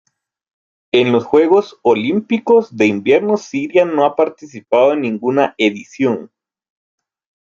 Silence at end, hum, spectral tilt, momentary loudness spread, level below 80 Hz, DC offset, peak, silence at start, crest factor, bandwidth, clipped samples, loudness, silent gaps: 1.15 s; none; -6 dB/octave; 6 LU; -62 dBFS; under 0.1%; -2 dBFS; 0.95 s; 14 dB; 7.4 kHz; under 0.1%; -15 LUFS; none